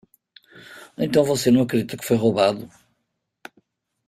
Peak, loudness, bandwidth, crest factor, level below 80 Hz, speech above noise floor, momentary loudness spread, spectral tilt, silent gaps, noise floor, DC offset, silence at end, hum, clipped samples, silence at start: -4 dBFS; -20 LUFS; 16 kHz; 18 dB; -58 dBFS; 57 dB; 16 LU; -5.5 dB/octave; none; -76 dBFS; under 0.1%; 1.4 s; none; under 0.1%; 0.55 s